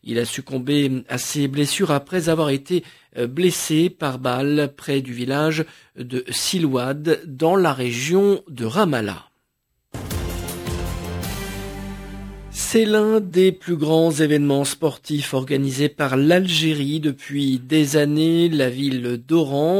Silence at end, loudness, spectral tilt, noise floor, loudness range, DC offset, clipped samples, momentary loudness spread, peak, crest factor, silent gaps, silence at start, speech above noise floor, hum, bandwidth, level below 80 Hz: 0 s; -20 LUFS; -5 dB/octave; -72 dBFS; 6 LU; under 0.1%; under 0.1%; 12 LU; -4 dBFS; 16 dB; none; 0.05 s; 53 dB; none; 16 kHz; -42 dBFS